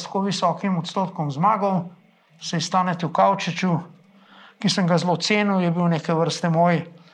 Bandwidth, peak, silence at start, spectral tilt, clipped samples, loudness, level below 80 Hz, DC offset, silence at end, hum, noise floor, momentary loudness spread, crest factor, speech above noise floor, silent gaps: 9.8 kHz; -6 dBFS; 0 s; -5.5 dB/octave; under 0.1%; -22 LUFS; -74 dBFS; under 0.1%; 0.25 s; none; -50 dBFS; 7 LU; 16 dB; 28 dB; none